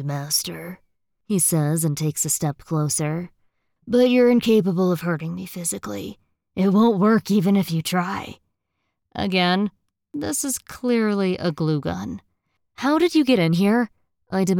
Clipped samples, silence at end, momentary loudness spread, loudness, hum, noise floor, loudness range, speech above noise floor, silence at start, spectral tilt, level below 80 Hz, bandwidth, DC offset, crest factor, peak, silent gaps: under 0.1%; 0 s; 14 LU; -21 LUFS; none; -77 dBFS; 4 LU; 56 dB; 0 s; -5 dB/octave; -58 dBFS; 19.5 kHz; under 0.1%; 16 dB; -6 dBFS; none